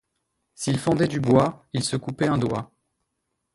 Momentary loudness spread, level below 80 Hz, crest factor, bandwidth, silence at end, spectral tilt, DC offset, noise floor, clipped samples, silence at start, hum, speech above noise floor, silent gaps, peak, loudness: 8 LU; -54 dBFS; 20 dB; 11.5 kHz; 0.9 s; -6 dB/octave; under 0.1%; -78 dBFS; under 0.1%; 0.6 s; none; 56 dB; none; -4 dBFS; -24 LUFS